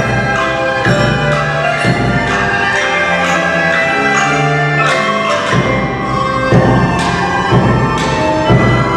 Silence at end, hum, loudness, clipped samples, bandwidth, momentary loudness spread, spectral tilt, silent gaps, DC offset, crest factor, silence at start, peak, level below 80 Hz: 0 s; none; -12 LUFS; under 0.1%; 11.5 kHz; 3 LU; -5.5 dB/octave; none; under 0.1%; 12 dB; 0 s; 0 dBFS; -30 dBFS